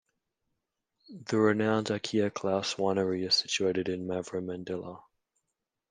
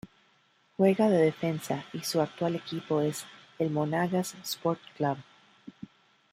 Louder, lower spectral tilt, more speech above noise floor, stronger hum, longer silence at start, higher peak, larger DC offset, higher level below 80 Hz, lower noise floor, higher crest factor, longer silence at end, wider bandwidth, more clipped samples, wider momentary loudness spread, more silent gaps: about the same, -30 LUFS vs -29 LUFS; second, -4.5 dB/octave vs -6 dB/octave; first, 56 dB vs 38 dB; neither; first, 1.1 s vs 0.05 s; about the same, -12 dBFS vs -12 dBFS; neither; about the same, -74 dBFS vs -72 dBFS; first, -85 dBFS vs -67 dBFS; about the same, 20 dB vs 18 dB; first, 0.9 s vs 0.65 s; second, 10 kHz vs 16 kHz; neither; second, 11 LU vs 21 LU; neither